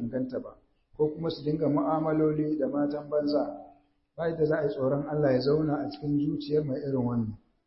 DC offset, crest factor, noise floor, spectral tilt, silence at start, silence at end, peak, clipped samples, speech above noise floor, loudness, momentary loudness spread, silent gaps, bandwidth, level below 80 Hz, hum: under 0.1%; 14 dB; -60 dBFS; -11.5 dB/octave; 0 s; 0.3 s; -14 dBFS; under 0.1%; 32 dB; -29 LUFS; 7 LU; none; 5.8 kHz; -60 dBFS; none